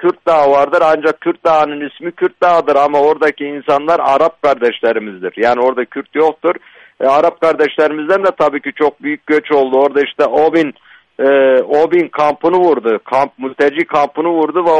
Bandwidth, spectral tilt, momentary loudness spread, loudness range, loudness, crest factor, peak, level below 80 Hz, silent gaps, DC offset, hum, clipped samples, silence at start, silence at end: 9.2 kHz; -6 dB/octave; 7 LU; 2 LU; -13 LUFS; 12 dB; -2 dBFS; -56 dBFS; none; under 0.1%; none; under 0.1%; 0 s; 0 s